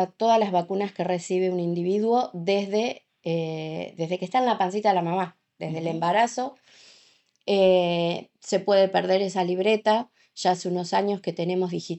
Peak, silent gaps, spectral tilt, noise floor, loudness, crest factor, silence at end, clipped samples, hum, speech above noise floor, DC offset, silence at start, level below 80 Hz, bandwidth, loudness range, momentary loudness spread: -8 dBFS; none; -5.5 dB/octave; -60 dBFS; -25 LUFS; 18 dB; 0 s; under 0.1%; none; 36 dB; under 0.1%; 0 s; -78 dBFS; 8.4 kHz; 3 LU; 11 LU